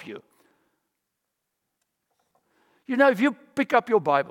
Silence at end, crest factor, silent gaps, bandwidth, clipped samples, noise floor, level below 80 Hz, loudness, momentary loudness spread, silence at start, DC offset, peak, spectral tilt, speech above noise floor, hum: 0 s; 20 dB; none; 16.5 kHz; under 0.1%; -81 dBFS; -80 dBFS; -22 LUFS; 16 LU; 0 s; under 0.1%; -6 dBFS; -6 dB/octave; 59 dB; none